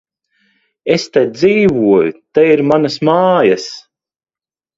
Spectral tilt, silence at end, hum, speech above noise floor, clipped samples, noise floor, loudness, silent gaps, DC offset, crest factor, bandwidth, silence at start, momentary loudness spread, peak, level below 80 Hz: -6 dB/octave; 1 s; none; over 78 dB; under 0.1%; under -90 dBFS; -12 LUFS; none; under 0.1%; 14 dB; 7.8 kHz; 0.85 s; 8 LU; 0 dBFS; -52 dBFS